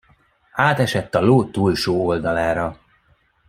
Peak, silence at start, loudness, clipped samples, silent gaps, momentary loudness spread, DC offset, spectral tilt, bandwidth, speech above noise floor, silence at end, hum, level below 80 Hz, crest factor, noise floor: -2 dBFS; 0.55 s; -19 LUFS; under 0.1%; none; 7 LU; under 0.1%; -6.5 dB/octave; 15.5 kHz; 42 dB; 0.75 s; none; -48 dBFS; 18 dB; -60 dBFS